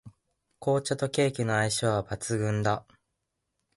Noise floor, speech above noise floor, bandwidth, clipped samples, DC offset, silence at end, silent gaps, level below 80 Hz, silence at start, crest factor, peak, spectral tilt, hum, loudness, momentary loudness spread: -81 dBFS; 54 dB; 11.5 kHz; under 0.1%; under 0.1%; 0.95 s; none; -58 dBFS; 0.05 s; 18 dB; -12 dBFS; -5 dB/octave; none; -28 LUFS; 5 LU